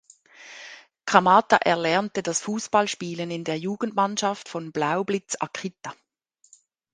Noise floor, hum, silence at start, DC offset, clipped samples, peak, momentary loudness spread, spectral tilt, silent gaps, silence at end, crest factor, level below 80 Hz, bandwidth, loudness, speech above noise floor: -65 dBFS; none; 0.4 s; under 0.1%; under 0.1%; 0 dBFS; 22 LU; -3.5 dB/octave; none; 1 s; 24 dB; -68 dBFS; 10 kHz; -24 LUFS; 41 dB